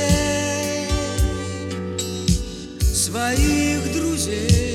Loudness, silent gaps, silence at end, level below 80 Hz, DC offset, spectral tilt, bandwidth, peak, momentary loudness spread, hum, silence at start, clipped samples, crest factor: -21 LUFS; none; 0 s; -26 dBFS; under 0.1%; -4.5 dB/octave; 16.5 kHz; -4 dBFS; 8 LU; none; 0 s; under 0.1%; 18 dB